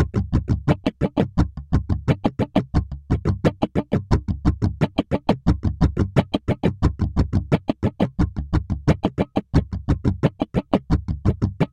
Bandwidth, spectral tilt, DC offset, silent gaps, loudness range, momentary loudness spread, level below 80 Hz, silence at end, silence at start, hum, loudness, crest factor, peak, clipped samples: 9.6 kHz; -8.5 dB/octave; under 0.1%; none; 1 LU; 4 LU; -30 dBFS; 0.05 s; 0 s; none; -23 LUFS; 20 dB; 0 dBFS; under 0.1%